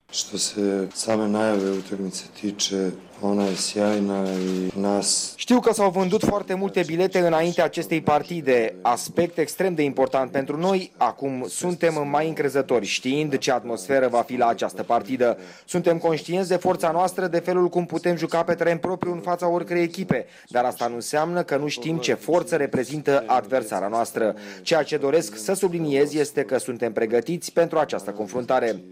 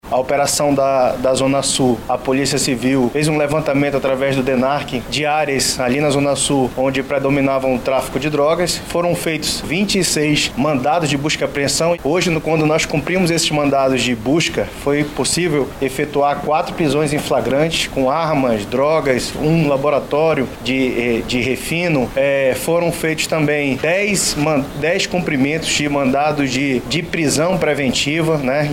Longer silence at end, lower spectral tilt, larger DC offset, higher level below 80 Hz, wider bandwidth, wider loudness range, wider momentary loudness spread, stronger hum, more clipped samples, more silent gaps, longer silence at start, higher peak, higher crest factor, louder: about the same, 0 s vs 0 s; about the same, -4.5 dB/octave vs -4 dB/octave; neither; second, -62 dBFS vs -40 dBFS; about the same, 16 kHz vs 17 kHz; about the same, 3 LU vs 1 LU; first, 6 LU vs 3 LU; neither; neither; neither; about the same, 0.1 s vs 0.05 s; second, -10 dBFS vs -2 dBFS; about the same, 14 dB vs 14 dB; second, -23 LUFS vs -16 LUFS